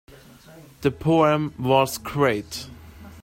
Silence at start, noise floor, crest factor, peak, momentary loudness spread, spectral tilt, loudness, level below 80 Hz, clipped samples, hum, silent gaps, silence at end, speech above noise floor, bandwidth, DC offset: 0.5 s; -43 dBFS; 20 dB; -4 dBFS; 15 LU; -5.5 dB/octave; -22 LUFS; -50 dBFS; under 0.1%; none; none; 0 s; 21 dB; 16.5 kHz; under 0.1%